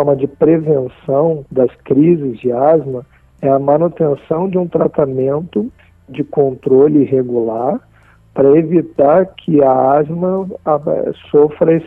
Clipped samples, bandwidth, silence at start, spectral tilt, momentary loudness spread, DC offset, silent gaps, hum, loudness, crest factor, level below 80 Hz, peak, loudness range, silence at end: under 0.1%; 3.8 kHz; 0 s; -11.5 dB/octave; 9 LU; under 0.1%; none; none; -14 LUFS; 12 dB; -50 dBFS; 0 dBFS; 3 LU; 0 s